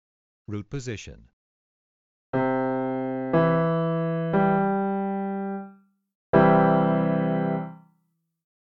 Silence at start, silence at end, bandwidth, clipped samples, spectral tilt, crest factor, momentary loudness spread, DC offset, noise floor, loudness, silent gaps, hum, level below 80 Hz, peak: 0.5 s; 1 s; 7.6 kHz; under 0.1%; -8.5 dB/octave; 20 dB; 16 LU; under 0.1%; -73 dBFS; -24 LUFS; 1.33-2.33 s, 6.15-6.33 s; none; -58 dBFS; -6 dBFS